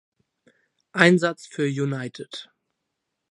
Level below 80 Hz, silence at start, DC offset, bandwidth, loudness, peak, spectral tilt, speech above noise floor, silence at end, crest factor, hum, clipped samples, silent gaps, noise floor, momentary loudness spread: -72 dBFS; 0.95 s; under 0.1%; 11.5 kHz; -22 LUFS; 0 dBFS; -5.5 dB/octave; 58 dB; 0.85 s; 26 dB; none; under 0.1%; none; -80 dBFS; 20 LU